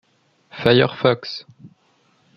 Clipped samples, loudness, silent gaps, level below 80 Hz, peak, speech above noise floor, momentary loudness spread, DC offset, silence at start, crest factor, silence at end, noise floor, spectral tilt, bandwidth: under 0.1%; -18 LUFS; none; -58 dBFS; 0 dBFS; 42 dB; 18 LU; under 0.1%; 0.55 s; 22 dB; 0.7 s; -61 dBFS; -7 dB/octave; 6.6 kHz